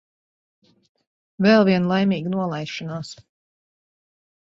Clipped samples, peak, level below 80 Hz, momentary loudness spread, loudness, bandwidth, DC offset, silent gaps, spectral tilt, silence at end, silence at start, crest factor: under 0.1%; -4 dBFS; -64 dBFS; 16 LU; -20 LUFS; 7.8 kHz; under 0.1%; none; -7 dB/octave; 1.35 s; 1.4 s; 20 dB